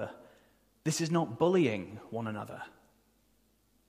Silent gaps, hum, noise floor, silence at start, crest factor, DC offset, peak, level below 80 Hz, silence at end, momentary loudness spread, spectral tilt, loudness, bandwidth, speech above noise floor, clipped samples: none; none; -70 dBFS; 0 s; 20 dB; under 0.1%; -14 dBFS; -72 dBFS; 1.2 s; 17 LU; -5.5 dB/octave; -32 LUFS; 15.5 kHz; 39 dB; under 0.1%